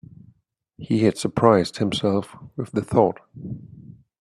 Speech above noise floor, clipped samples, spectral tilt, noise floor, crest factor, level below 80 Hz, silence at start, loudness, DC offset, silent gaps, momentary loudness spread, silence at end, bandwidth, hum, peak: 42 dB; under 0.1%; -6.5 dB/octave; -63 dBFS; 22 dB; -54 dBFS; 0.8 s; -21 LUFS; under 0.1%; none; 19 LU; 0.3 s; 12.5 kHz; none; -2 dBFS